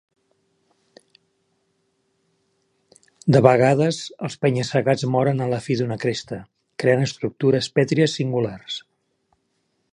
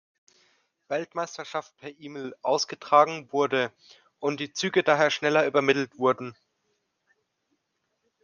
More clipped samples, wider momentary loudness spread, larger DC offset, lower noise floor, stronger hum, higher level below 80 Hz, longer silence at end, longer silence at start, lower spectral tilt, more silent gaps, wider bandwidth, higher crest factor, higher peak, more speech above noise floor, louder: neither; about the same, 15 LU vs 16 LU; neither; second, -71 dBFS vs -78 dBFS; neither; first, -62 dBFS vs -80 dBFS; second, 1.15 s vs 1.9 s; first, 3.25 s vs 0.9 s; first, -6 dB/octave vs -4 dB/octave; neither; first, 10.5 kHz vs 7.2 kHz; about the same, 22 dB vs 24 dB; first, 0 dBFS vs -4 dBFS; about the same, 51 dB vs 52 dB; first, -21 LUFS vs -25 LUFS